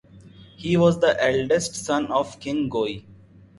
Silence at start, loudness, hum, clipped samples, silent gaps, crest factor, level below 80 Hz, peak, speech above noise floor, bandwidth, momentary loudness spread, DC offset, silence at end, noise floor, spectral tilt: 0.15 s; -22 LUFS; none; under 0.1%; none; 18 dB; -54 dBFS; -4 dBFS; 25 dB; 11.5 kHz; 10 LU; under 0.1%; 0.45 s; -47 dBFS; -5 dB/octave